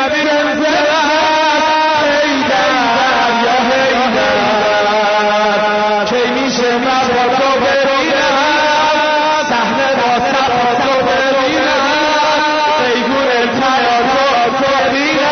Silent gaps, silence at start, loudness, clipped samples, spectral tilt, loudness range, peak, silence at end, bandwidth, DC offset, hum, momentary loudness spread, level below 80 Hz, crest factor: none; 0 s; -12 LUFS; under 0.1%; -3 dB/octave; 1 LU; -2 dBFS; 0 s; 6.6 kHz; under 0.1%; none; 2 LU; -46 dBFS; 10 dB